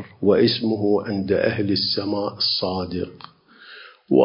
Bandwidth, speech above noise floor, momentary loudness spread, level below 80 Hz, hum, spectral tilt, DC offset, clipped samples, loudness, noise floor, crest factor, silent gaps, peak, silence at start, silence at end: 5.6 kHz; 23 dB; 12 LU; -50 dBFS; none; -9.5 dB/octave; under 0.1%; under 0.1%; -21 LUFS; -45 dBFS; 18 dB; none; -4 dBFS; 0 s; 0 s